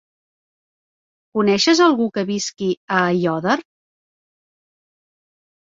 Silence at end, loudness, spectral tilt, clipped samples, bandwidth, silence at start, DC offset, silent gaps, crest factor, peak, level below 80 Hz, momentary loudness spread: 2.15 s; -18 LUFS; -4.5 dB/octave; under 0.1%; 7.8 kHz; 1.35 s; under 0.1%; 2.77-2.88 s; 20 dB; -2 dBFS; -64 dBFS; 9 LU